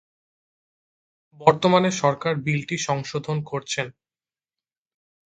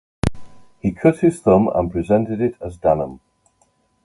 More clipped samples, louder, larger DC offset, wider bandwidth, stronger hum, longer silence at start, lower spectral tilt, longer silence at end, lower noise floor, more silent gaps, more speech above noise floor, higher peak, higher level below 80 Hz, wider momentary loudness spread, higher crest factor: neither; second, -23 LUFS vs -19 LUFS; neither; second, 9.4 kHz vs 11.5 kHz; neither; first, 1.4 s vs 0.25 s; second, -5 dB/octave vs -8 dB/octave; first, 1.4 s vs 0.9 s; first, under -90 dBFS vs -62 dBFS; neither; first, over 68 dB vs 45 dB; about the same, 0 dBFS vs 0 dBFS; second, -64 dBFS vs -40 dBFS; about the same, 9 LU vs 10 LU; first, 26 dB vs 18 dB